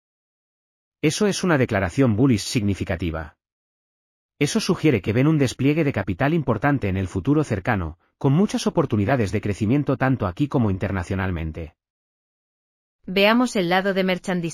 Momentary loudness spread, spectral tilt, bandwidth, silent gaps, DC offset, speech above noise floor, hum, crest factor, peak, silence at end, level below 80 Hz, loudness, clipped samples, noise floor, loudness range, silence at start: 7 LU; -6 dB/octave; 15 kHz; 3.52-4.29 s, 11.90-12.99 s; under 0.1%; over 69 dB; none; 18 dB; -4 dBFS; 0 s; -46 dBFS; -21 LUFS; under 0.1%; under -90 dBFS; 3 LU; 1.05 s